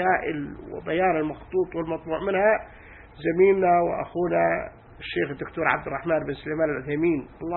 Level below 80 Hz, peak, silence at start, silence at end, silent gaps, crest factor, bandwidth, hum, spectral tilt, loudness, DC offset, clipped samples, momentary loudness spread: -50 dBFS; -6 dBFS; 0 s; 0 s; none; 20 dB; 4.2 kHz; none; -11 dB/octave; -25 LUFS; under 0.1%; under 0.1%; 10 LU